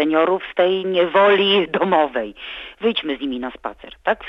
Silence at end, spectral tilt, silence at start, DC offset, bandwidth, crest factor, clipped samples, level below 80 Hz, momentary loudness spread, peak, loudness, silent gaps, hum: 0 s; -6.5 dB/octave; 0 s; under 0.1%; 5.6 kHz; 16 dB; under 0.1%; -54 dBFS; 16 LU; -4 dBFS; -18 LUFS; none; none